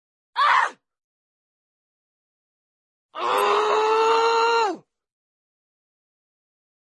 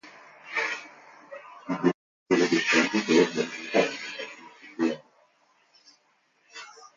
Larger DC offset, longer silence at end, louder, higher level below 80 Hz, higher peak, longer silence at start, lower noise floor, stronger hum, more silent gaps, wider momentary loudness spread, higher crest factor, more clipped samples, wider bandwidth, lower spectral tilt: neither; first, 2.05 s vs 0.1 s; first, -20 LUFS vs -26 LUFS; second, -88 dBFS vs -76 dBFS; about the same, -6 dBFS vs -8 dBFS; first, 0.35 s vs 0.05 s; first, under -90 dBFS vs -68 dBFS; neither; first, 1.04-3.09 s vs 1.94-2.26 s; second, 12 LU vs 23 LU; about the same, 18 dB vs 20 dB; neither; first, 12 kHz vs 7.6 kHz; second, -1 dB/octave vs -4 dB/octave